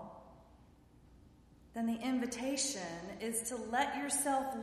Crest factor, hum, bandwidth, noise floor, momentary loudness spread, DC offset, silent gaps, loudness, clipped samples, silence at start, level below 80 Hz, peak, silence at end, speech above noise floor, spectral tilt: 18 dB; none; 14.5 kHz; -62 dBFS; 11 LU; under 0.1%; none; -36 LUFS; under 0.1%; 0 s; -66 dBFS; -20 dBFS; 0 s; 25 dB; -2.5 dB/octave